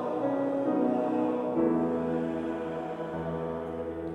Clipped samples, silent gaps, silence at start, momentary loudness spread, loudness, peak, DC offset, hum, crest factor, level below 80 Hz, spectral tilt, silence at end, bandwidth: under 0.1%; none; 0 s; 8 LU; -30 LUFS; -14 dBFS; under 0.1%; none; 16 dB; -62 dBFS; -9 dB/octave; 0 s; 9 kHz